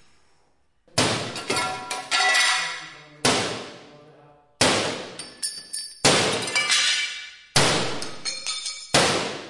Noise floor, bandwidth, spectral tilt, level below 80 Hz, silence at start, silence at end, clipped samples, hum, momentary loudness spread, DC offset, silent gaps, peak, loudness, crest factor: -67 dBFS; 11.5 kHz; -2 dB/octave; -56 dBFS; 0.95 s; 0 s; under 0.1%; none; 13 LU; under 0.1%; none; -6 dBFS; -22 LUFS; 20 dB